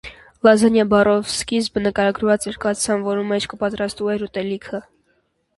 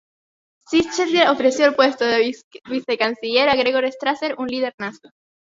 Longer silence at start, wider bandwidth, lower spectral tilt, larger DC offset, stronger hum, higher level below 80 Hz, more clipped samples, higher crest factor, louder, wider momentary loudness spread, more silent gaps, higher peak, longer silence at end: second, 0.05 s vs 0.7 s; first, 11.5 kHz vs 7.8 kHz; first, -4.5 dB/octave vs -3 dB/octave; neither; neither; first, -50 dBFS vs -58 dBFS; neither; about the same, 20 dB vs 20 dB; about the same, -19 LUFS vs -19 LUFS; about the same, 11 LU vs 11 LU; second, none vs 2.44-2.51 s, 4.74-4.78 s; about the same, 0 dBFS vs 0 dBFS; first, 0.75 s vs 0.5 s